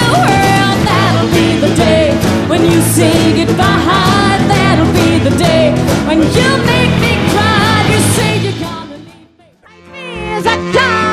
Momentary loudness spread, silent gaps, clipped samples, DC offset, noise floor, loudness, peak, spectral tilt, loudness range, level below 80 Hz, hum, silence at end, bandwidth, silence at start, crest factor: 6 LU; none; under 0.1%; under 0.1%; -44 dBFS; -10 LUFS; 0 dBFS; -5 dB/octave; 4 LU; -30 dBFS; none; 0 s; 14 kHz; 0 s; 10 dB